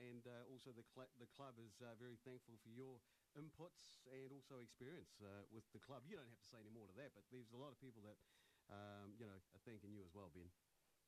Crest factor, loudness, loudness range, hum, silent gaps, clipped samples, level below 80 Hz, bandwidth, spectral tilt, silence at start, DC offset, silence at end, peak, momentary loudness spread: 14 dB; -62 LUFS; 1 LU; none; none; under 0.1%; -88 dBFS; 13.5 kHz; -6 dB/octave; 0 s; under 0.1%; 0 s; -48 dBFS; 5 LU